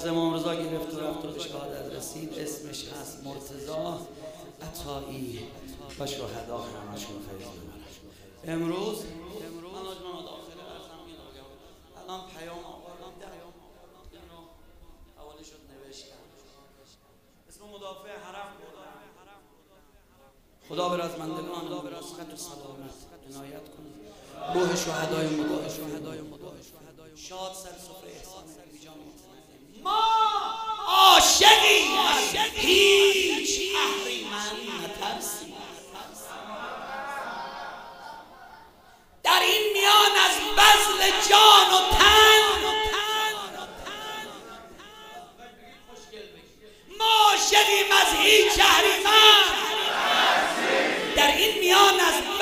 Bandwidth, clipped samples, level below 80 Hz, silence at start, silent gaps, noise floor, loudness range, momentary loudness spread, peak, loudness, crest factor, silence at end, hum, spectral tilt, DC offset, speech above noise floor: 16 kHz; under 0.1%; -50 dBFS; 0 s; none; -60 dBFS; 22 LU; 26 LU; 0 dBFS; -19 LUFS; 24 dB; 0 s; none; -1 dB/octave; under 0.1%; 36 dB